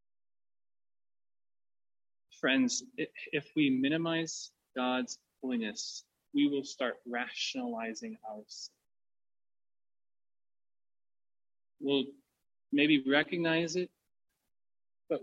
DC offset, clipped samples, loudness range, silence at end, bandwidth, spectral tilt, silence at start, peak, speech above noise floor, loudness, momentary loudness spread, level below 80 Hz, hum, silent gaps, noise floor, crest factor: under 0.1%; under 0.1%; 10 LU; 0 s; 8.4 kHz; -3.5 dB/octave; 2.45 s; -14 dBFS; over 57 dB; -33 LUFS; 14 LU; -84 dBFS; none; none; under -90 dBFS; 22 dB